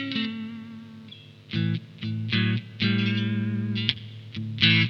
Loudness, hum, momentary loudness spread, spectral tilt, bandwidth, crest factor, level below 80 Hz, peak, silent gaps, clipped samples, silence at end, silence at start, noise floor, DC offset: -27 LUFS; 50 Hz at -50 dBFS; 19 LU; -6.5 dB/octave; 6.4 kHz; 24 dB; -62 dBFS; -4 dBFS; none; under 0.1%; 0 s; 0 s; -46 dBFS; under 0.1%